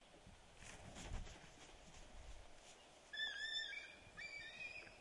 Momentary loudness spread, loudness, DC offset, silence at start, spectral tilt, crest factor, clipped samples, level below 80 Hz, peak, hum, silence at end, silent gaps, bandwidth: 18 LU; -50 LUFS; under 0.1%; 0 s; -2 dB/octave; 18 dB; under 0.1%; -62 dBFS; -34 dBFS; none; 0 s; none; 11.5 kHz